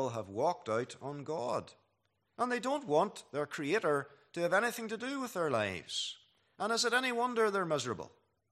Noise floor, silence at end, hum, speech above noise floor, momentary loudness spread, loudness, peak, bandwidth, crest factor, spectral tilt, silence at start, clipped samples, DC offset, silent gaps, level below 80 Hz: -79 dBFS; 0.45 s; none; 45 dB; 9 LU; -34 LUFS; -16 dBFS; 14.5 kHz; 20 dB; -3.5 dB/octave; 0 s; under 0.1%; under 0.1%; none; -80 dBFS